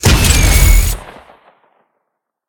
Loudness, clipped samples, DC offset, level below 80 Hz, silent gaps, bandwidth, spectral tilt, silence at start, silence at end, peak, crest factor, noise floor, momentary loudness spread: -11 LUFS; under 0.1%; under 0.1%; -14 dBFS; none; over 20 kHz; -3.5 dB/octave; 0.05 s; 1.4 s; 0 dBFS; 12 dB; -73 dBFS; 11 LU